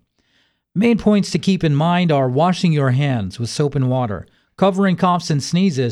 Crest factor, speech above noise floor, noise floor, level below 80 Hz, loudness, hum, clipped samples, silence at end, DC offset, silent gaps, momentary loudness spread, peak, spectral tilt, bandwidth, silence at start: 14 dB; 46 dB; -63 dBFS; -48 dBFS; -17 LUFS; none; under 0.1%; 0 s; under 0.1%; none; 6 LU; -4 dBFS; -6.5 dB/octave; 11.5 kHz; 0.75 s